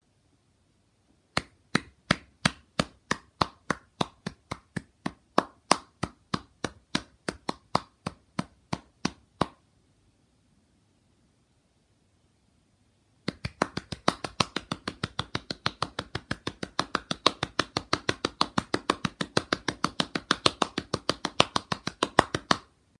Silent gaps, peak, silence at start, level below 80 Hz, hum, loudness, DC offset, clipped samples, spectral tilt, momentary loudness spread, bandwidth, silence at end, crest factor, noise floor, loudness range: none; 0 dBFS; 1.35 s; -56 dBFS; none; -31 LUFS; under 0.1%; under 0.1%; -3.5 dB/octave; 13 LU; 11.5 kHz; 0.4 s; 32 dB; -68 dBFS; 11 LU